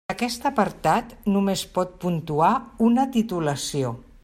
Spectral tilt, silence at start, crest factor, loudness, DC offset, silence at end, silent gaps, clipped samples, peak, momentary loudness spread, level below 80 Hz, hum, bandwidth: -5.5 dB/octave; 0.1 s; 16 dB; -23 LUFS; under 0.1%; 0.2 s; none; under 0.1%; -6 dBFS; 6 LU; -50 dBFS; none; 16 kHz